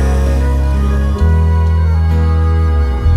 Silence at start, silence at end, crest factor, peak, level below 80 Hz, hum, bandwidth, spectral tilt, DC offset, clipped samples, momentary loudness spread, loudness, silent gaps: 0 s; 0 s; 8 dB; -2 dBFS; -12 dBFS; none; 6.4 kHz; -8 dB/octave; under 0.1%; under 0.1%; 2 LU; -13 LUFS; none